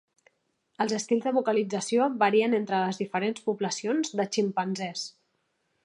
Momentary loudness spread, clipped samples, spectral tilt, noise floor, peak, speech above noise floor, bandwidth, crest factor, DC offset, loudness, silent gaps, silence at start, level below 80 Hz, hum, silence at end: 8 LU; under 0.1%; -4.5 dB/octave; -75 dBFS; -10 dBFS; 48 dB; 11 kHz; 18 dB; under 0.1%; -27 LUFS; none; 0.8 s; -82 dBFS; none; 0.75 s